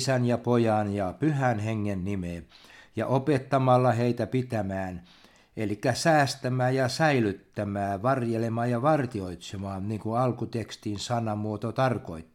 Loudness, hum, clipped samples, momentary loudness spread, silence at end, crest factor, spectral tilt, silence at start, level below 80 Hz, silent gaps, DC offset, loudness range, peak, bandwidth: -27 LUFS; none; under 0.1%; 12 LU; 0.1 s; 18 dB; -6.5 dB/octave; 0 s; -60 dBFS; none; under 0.1%; 3 LU; -10 dBFS; 14 kHz